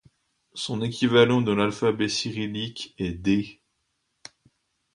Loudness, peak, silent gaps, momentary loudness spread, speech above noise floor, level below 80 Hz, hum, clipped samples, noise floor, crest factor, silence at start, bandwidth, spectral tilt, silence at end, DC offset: -24 LUFS; -6 dBFS; none; 14 LU; 51 dB; -54 dBFS; none; under 0.1%; -75 dBFS; 20 dB; 0.55 s; 11 kHz; -5.5 dB/octave; 1.45 s; under 0.1%